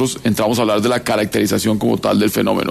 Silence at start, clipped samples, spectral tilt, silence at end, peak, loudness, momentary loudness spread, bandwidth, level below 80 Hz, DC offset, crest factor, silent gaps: 0 s; under 0.1%; -5 dB/octave; 0 s; -4 dBFS; -16 LUFS; 2 LU; 14 kHz; -48 dBFS; under 0.1%; 12 dB; none